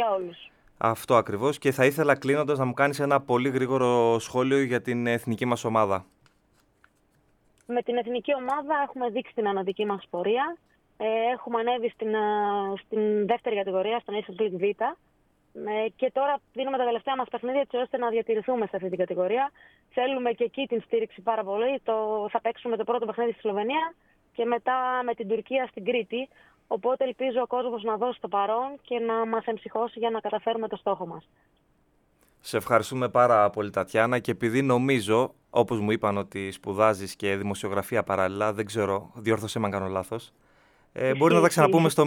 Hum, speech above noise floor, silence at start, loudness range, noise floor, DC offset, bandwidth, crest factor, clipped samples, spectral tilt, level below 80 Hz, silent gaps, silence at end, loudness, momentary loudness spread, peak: none; 40 dB; 0 s; 5 LU; -66 dBFS; under 0.1%; 18 kHz; 22 dB; under 0.1%; -5.5 dB/octave; -68 dBFS; none; 0 s; -26 LUFS; 8 LU; -4 dBFS